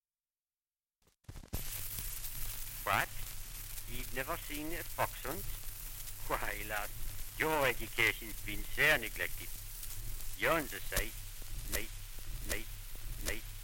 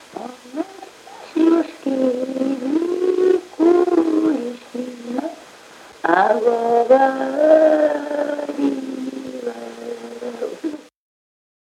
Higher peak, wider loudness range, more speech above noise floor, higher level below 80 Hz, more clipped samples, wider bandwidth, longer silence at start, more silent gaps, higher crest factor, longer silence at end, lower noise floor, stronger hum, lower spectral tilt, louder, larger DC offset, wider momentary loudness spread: second, -16 dBFS vs 0 dBFS; about the same, 6 LU vs 8 LU; first, over 55 dB vs 27 dB; first, -46 dBFS vs -72 dBFS; neither; first, 17 kHz vs 12 kHz; first, 1.3 s vs 0.1 s; neither; about the same, 22 dB vs 18 dB; second, 0 s vs 0.9 s; first, under -90 dBFS vs -43 dBFS; neither; second, -2.5 dB/octave vs -5 dB/octave; second, -37 LUFS vs -19 LUFS; neither; second, 14 LU vs 17 LU